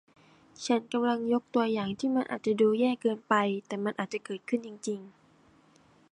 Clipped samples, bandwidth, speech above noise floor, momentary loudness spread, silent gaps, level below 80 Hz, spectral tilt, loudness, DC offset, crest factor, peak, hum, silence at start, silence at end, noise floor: under 0.1%; 10.5 kHz; 33 dB; 11 LU; none; -74 dBFS; -5.5 dB/octave; -30 LUFS; under 0.1%; 20 dB; -10 dBFS; none; 0.6 s; 1.05 s; -62 dBFS